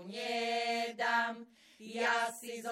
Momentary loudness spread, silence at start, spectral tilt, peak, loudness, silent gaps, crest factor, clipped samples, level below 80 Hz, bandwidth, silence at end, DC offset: 13 LU; 0 s; -2 dB/octave; -20 dBFS; -34 LUFS; none; 16 dB; under 0.1%; -90 dBFS; 16.5 kHz; 0 s; under 0.1%